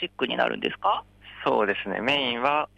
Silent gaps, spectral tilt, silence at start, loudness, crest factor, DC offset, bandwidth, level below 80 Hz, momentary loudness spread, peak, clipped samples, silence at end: none; -5 dB/octave; 0 s; -25 LUFS; 16 dB; under 0.1%; 10 kHz; -60 dBFS; 4 LU; -10 dBFS; under 0.1%; 0.1 s